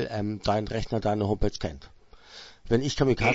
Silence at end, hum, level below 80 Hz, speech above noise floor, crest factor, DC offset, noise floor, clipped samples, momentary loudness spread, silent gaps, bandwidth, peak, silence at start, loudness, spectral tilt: 0 s; none; -40 dBFS; 22 dB; 20 dB; under 0.1%; -49 dBFS; under 0.1%; 21 LU; none; 8 kHz; -8 dBFS; 0 s; -28 LUFS; -6 dB/octave